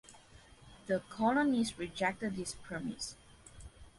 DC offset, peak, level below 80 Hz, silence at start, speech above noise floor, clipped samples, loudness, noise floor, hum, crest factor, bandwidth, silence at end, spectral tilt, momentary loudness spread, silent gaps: under 0.1%; -18 dBFS; -60 dBFS; 0.1 s; 24 dB; under 0.1%; -35 LUFS; -59 dBFS; none; 20 dB; 11.5 kHz; 0.1 s; -4.5 dB/octave; 24 LU; none